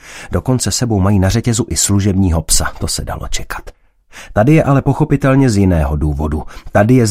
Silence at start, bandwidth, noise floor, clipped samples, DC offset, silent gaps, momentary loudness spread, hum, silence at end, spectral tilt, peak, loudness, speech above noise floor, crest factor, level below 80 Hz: 0.05 s; 16 kHz; -38 dBFS; under 0.1%; under 0.1%; none; 11 LU; none; 0 s; -5.5 dB/octave; 0 dBFS; -14 LUFS; 26 dB; 14 dB; -26 dBFS